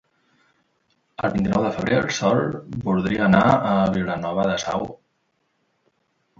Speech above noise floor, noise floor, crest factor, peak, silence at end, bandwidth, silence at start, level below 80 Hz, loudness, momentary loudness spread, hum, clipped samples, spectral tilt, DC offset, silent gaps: 50 dB; -70 dBFS; 20 dB; -2 dBFS; 1.45 s; 7.6 kHz; 1.2 s; -50 dBFS; -21 LUFS; 11 LU; none; under 0.1%; -6 dB/octave; under 0.1%; none